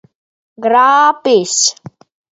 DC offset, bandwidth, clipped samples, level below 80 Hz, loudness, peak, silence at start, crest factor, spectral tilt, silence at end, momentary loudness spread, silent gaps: under 0.1%; 8.2 kHz; under 0.1%; -64 dBFS; -11 LUFS; 0 dBFS; 0.6 s; 14 dB; -1.5 dB/octave; 0.6 s; 5 LU; none